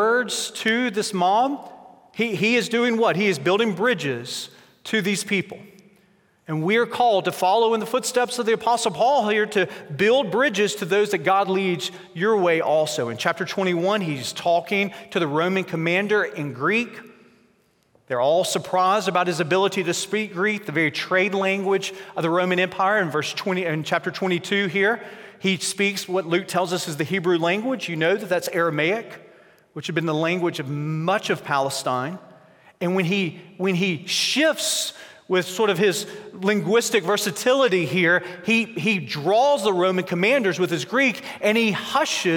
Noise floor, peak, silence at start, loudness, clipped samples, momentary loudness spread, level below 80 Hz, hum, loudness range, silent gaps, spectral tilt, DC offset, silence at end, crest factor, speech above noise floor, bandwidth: -62 dBFS; -4 dBFS; 0 s; -22 LUFS; under 0.1%; 7 LU; -74 dBFS; none; 4 LU; none; -4 dB/octave; under 0.1%; 0 s; 18 dB; 40 dB; 17 kHz